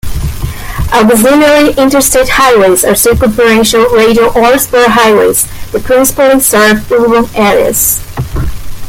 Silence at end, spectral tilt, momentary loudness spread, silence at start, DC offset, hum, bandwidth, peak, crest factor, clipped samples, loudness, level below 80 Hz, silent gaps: 0 s; -3.5 dB/octave; 12 LU; 0.05 s; under 0.1%; none; 17.5 kHz; 0 dBFS; 8 dB; 0.1%; -6 LUFS; -24 dBFS; none